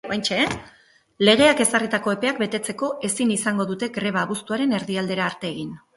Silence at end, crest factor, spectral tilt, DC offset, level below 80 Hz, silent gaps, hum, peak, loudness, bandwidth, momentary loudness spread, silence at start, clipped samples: 0.2 s; 20 dB; -3.5 dB/octave; under 0.1%; -58 dBFS; none; none; -2 dBFS; -22 LUFS; 12 kHz; 10 LU; 0.05 s; under 0.1%